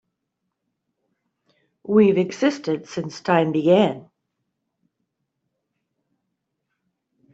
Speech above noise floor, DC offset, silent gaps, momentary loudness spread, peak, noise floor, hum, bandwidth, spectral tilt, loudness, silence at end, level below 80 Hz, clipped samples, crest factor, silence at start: 60 dB; under 0.1%; none; 13 LU; -4 dBFS; -79 dBFS; none; 8 kHz; -6.5 dB/octave; -20 LUFS; 3.35 s; -68 dBFS; under 0.1%; 20 dB; 1.9 s